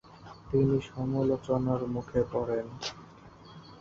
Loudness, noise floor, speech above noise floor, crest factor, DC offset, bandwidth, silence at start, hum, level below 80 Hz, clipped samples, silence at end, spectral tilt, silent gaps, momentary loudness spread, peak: -30 LUFS; -52 dBFS; 22 dB; 18 dB; under 0.1%; 7.6 kHz; 0.05 s; none; -54 dBFS; under 0.1%; 0 s; -7.5 dB/octave; none; 22 LU; -14 dBFS